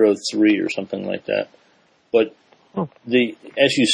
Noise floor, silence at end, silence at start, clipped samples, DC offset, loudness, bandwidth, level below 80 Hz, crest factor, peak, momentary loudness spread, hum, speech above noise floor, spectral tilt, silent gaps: -58 dBFS; 0 s; 0 s; under 0.1%; under 0.1%; -21 LUFS; 10 kHz; -68 dBFS; 18 dB; -2 dBFS; 11 LU; none; 39 dB; -4 dB/octave; none